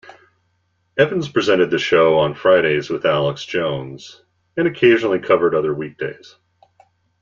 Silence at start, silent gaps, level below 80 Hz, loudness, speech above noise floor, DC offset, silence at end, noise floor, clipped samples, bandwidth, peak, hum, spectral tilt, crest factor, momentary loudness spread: 0.1 s; none; -58 dBFS; -17 LUFS; 49 dB; under 0.1%; 1.1 s; -66 dBFS; under 0.1%; 7.4 kHz; -2 dBFS; none; -6 dB/octave; 18 dB; 14 LU